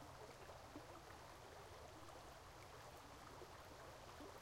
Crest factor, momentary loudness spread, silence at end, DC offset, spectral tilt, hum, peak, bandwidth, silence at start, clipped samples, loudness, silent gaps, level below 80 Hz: 16 dB; 1 LU; 0 s; under 0.1%; -4 dB/octave; none; -42 dBFS; 16 kHz; 0 s; under 0.1%; -59 LUFS; none; -70 dBFS